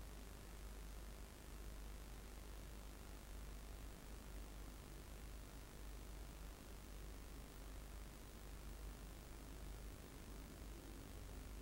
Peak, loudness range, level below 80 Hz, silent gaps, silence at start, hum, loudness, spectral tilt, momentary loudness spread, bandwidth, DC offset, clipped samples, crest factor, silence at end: -40 dBFS; 0 LU; -56 dBFS; none; 0 s; none; -57 LUFS; -4.5 dB/octave; 2 LU; 16 kHz; under 0.1%; under 0.1%; 16 dB; 0 s